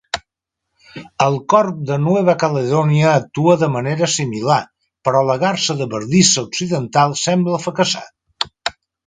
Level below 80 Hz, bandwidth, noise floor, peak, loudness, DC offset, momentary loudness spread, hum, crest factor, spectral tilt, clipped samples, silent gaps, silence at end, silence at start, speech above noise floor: -56 dBFS; 9.6 kHz; -79 dBFS; 0 dBFS; -17 LUFS; under 0.1%; 11 LU; none; 18 dB; -4.5 dB/octave; under 0.1%; none; 0.35 s; 0.15 s; 63 dB